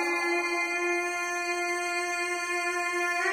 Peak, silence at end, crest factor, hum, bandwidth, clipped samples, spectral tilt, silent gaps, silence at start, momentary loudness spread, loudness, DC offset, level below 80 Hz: -16 dBFS; 0 s; 12 dB; none; 15.5 kHz; under 0.1%; -0.5 dB/octave; none; 0 s; 2 LU; -28 LUFS; under 0.1%; -70 dBFS